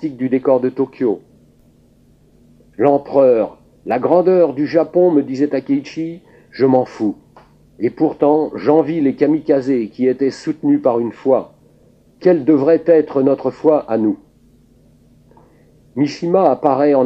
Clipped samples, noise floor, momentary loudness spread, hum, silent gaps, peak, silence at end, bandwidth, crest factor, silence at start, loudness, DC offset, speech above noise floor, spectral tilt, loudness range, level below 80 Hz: under 0.1%; -51 dBFS; 10 LU; none; none; 0 dBFS; 0 s; 8 kHz; 16 dB; 0 s; -16 LUFS; under 0.1%; 36 dB; -8.5 dB/octave; 4 LU; -58 dBFS